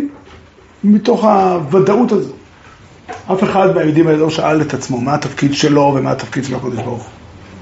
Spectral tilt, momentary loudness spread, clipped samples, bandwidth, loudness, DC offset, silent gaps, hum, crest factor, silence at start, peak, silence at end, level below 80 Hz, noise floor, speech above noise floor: -6 dB/octave; 11 LU; under 0.1%; 8 kHz; -14 LUFS; under 0.1%; none; none; 14 dB; 0 s; 0 dBFS; 0 s; -48 dBFS; -41 dBFS; 28 dB